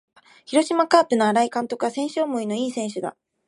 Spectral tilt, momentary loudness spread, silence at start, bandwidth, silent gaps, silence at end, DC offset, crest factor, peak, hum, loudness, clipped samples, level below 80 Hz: -4 dB/octave; 10 LU; 0.5 s; 11.5 kHz; none; 0.35 s; under 0.1%; 20 dB; -2 dBFS; none; -22 LUFS; under 0.1%; -76 dBFS